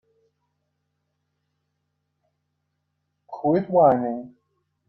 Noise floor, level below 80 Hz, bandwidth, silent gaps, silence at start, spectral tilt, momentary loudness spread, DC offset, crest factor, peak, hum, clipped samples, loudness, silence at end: -76 dBFS; -70 dBFS; 5.6 kHz; none; 3.3 s; -11 dB/octave; 17 LU; under 0.1%; 22 dB; -6 dBFS; none; under 0.1%; -21 LUFS; 0.6 s